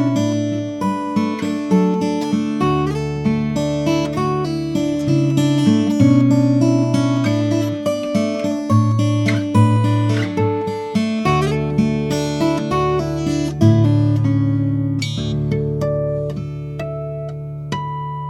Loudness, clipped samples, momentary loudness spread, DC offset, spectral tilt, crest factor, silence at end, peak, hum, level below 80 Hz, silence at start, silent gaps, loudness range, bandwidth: -18 LUFS; under 0.1%; 8 LU; under 0.1%; -7.5 dB/octave; 16 dB; 0 s; -2 dBFS; none; -42 dBFS; 0 s; none; 3 LU; 12 kHz